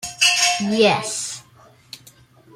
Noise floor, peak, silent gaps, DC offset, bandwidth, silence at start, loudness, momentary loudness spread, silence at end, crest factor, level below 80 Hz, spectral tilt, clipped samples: -51 dBFS; 0 dBFS; none; under 0.1%; 16.5 kHz; 0 s; -17 LUFS; 14 LU; 0.6 s; 22 dB; -62 dBFS; -2 dB/octave; under 0.1%